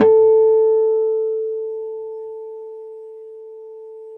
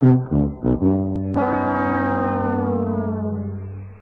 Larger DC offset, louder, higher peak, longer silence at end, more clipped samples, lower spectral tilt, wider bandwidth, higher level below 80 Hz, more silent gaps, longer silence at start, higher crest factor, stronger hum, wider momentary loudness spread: second, under 0.1% vs 0.1%; first, -17 LUFS vs -21 LUFS; first, -2 dBFS vs -6 dBFS; about the same, 0 s vs 0.05 s; neither; second, -9 dB/octave vs -11.5 dB/octave; second, 3.3 kHz vs 4.5 kHz; second, -78 dBFS vs -38 dBFS; neither; about the same, 0 s vs 0 s; about the same, 16 dB vs 14 dB; neither; first, 24 LU vs 8 LU